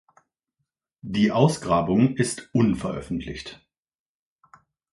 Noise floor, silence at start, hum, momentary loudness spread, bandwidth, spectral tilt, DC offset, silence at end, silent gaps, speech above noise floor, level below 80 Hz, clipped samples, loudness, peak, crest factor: -80 dBFS; 1.05 s; none; 16 LU; 11.5 kHz; -6 dB/octave; under 0.1%; 1.4 s; none; 58 dB; -50 dBFS; under 0.1%; -23 LUFS; -4 dBFS; 22 dB